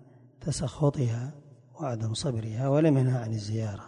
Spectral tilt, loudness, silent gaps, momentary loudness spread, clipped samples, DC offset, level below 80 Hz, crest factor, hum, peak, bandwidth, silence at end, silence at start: -7 dB/octave; -29 LUFS; none; 12 LU; under 0.1%; under 0.1%; -54 dBFS; 16 dB; none; -12 dBFS; 11 kHz; 0 s; 0.4 s